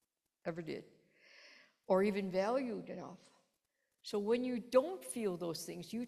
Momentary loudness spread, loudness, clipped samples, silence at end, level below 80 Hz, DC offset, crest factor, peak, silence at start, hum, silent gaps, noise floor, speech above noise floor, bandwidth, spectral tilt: 16 LU; -38 LUFS; under 0.1%; 0 s; -78 dBFS; under 0.1%; 22 dB; -16 dBFS; 0.45 s; none; none; -85 dBFS; 48 dB; 14 kHz; -5.5 dB/octave